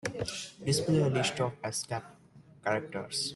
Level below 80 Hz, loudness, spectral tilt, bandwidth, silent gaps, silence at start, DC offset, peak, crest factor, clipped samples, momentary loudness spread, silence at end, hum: -64 dBFS; -32 LUFS; -4.5 dB/octave; 12.5 kHz; none; 0.05 s; under 0.1%; -16 dBFS; 16 dB; under 0.1%; 10 LU; 0 s; none